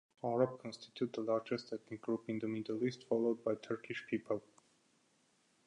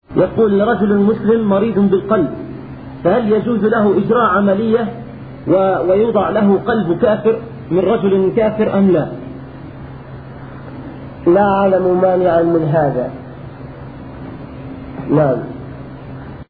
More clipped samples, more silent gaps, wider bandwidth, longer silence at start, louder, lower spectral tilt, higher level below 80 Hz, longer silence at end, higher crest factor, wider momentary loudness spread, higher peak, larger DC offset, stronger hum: neither; neither; first, 10.5 kHz vs 4.7 kHz; first, 0.25 s vs 0.1 s; second, -39 LUFS vs -14 LUFS; second, -6.5 dB/octave vs -12 dB/octave; second, -84 dBFS vs -42 dBFS; first, 1.25 s vs 0.05 s; first, 20 dB vs 14 dB; second, 7 LU vs 19 LU; second, -18 dBFS vs 0 dBFS; second, under 0.1% vs 0.3%; neither